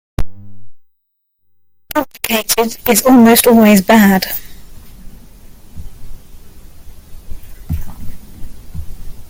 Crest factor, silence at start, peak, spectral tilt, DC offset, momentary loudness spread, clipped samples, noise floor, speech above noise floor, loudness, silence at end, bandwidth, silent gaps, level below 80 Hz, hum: 14 dB; 0.2 s; 0 dBFS; -4.5 dB/octave; under 0.1%; 25 LU; under 0.1%; -67 dBFS; 57 dB; -11 LUFS; 0.05 s; 17 kHz; none; -32 dBFS; none